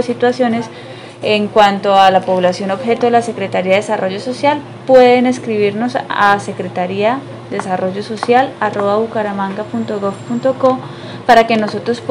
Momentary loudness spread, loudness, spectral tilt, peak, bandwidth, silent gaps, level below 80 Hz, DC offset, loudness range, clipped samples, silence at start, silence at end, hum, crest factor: 11 LU; -14 LUFS; -5.5 dB/octave; 0 dBFS; 11.5 kHz; none; -58 dBFS; under 0.1%; 4 LU; 0.4%; 0 s; 0 s; none; 14 dB